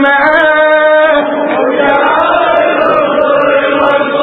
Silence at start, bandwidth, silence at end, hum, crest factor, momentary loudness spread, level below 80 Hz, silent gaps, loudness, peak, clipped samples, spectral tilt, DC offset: 0 s; 4.5 kHz; 0 s; none; 8 dB; 3 LU; -46 dBFS; none; -8 LUFS; 0 dBFS; 0.1%; -6.5 dB/octave; under 0.1%